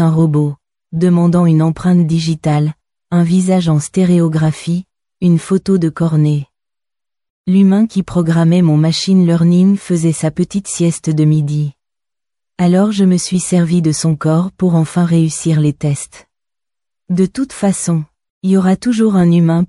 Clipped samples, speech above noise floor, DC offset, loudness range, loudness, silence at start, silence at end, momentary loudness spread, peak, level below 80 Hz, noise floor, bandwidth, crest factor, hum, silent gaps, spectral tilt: under 0.1%; 77 dB; under 0.1%; 4 LU; -13 LUFS; 0 s; 0 s; 8 LU; -2 dBFS; -48 dBFS; -89 dBFS; 11.5 kHz; 12 dB; none; 7.30-7.44 s, 18.30-18.41 s; -7 dB/octave